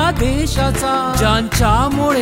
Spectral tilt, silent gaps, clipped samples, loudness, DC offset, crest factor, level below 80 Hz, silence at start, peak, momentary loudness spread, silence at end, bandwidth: -5 dB/octave; none; under 0.1%; -16 LUFS; under 0.1%; 12 dB; -22 dBFS; 0 s; -2 dBFS; 3 LU; 0 s; 16 kHz